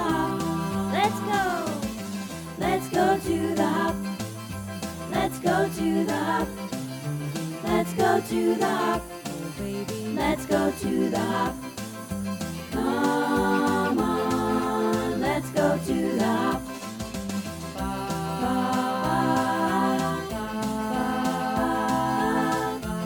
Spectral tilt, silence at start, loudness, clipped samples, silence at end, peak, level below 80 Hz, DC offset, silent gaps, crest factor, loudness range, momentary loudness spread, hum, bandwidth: -5.5 dB/octave; 0 s; -26 LUFS; under 0.1%; 0 s; -10 dBFS; -48 dBFS; under 0.1%; none; 16 dB; 3 LU; 10 LU; none; 19 kHz